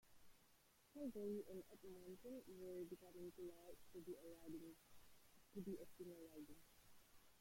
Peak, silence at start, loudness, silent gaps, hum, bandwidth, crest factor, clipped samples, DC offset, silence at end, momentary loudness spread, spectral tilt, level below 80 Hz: -40 dBFS; 0.05 s; -57 LUFS; none; none; 16.5 kHz; 16 dB; under 0.1%; under 0.1%; 0 s; 11 LU; -6 dB/octave; -80 dBFS